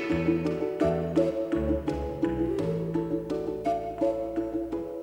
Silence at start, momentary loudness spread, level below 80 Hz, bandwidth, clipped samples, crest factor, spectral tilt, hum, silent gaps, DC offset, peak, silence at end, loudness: 0 s; 5 LU; -44 dBFS; 10.5 kHz; under 0.1%; 14 dB; -8.5 dB/octave; none; none; under 0.1%; -14 dBFS; 0 s; -29 LUFS